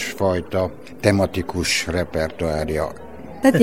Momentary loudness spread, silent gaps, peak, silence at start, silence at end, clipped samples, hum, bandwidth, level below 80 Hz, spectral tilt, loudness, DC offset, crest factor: 9 LU; none; 0 dBFS; 0 s; 0 s; under 0.1%; none; 17 kHz; -40 dBFS; -5 dB/octave; -22 LUFS; 0.9%; 20 dB